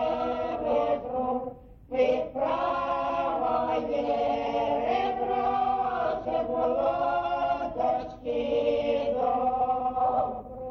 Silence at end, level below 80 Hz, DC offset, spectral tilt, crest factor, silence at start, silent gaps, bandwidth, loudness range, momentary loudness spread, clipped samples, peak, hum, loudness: 0 s; -52 dBFS; under 0.1%; -7 dB/octave; 14 dB; 0 s; none; 6.6 kHz; 1 LU; 4 LU; under 0.1%; -14 dBFS; none; -28 LUFS